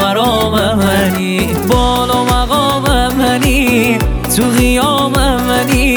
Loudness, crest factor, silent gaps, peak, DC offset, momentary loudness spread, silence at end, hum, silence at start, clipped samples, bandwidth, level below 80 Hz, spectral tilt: -12 LUFS; 12 dB; none; 0 dBFS; under 0.1%; 3 LU; 0 s; none; 0 s; under 0.1%; over 20 kHz; -20 dBFS; -4.5 dB/octave